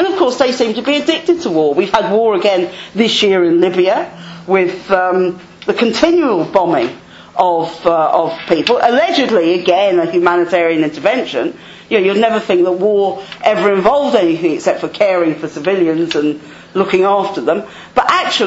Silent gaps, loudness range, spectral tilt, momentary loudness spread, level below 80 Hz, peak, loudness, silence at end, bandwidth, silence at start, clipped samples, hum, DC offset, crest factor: none; 2 LU; -5 dB/octave; 7 LU; -52 dBFS; 0 dBFS; -13 LUFS; 0 s; 8 kHz; 0 s; under 0.1%; none; under 0.1%; 14 dB